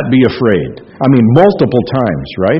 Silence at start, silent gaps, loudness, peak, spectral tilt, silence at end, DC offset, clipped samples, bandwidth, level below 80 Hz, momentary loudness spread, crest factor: 0 s; none; -11 LUFS; 0 dBFS; -10 dB/octave; 0 s; under 0.1%; 0.4%; 5.8 kHz; -40 dBFS; 8 LU; 10 dB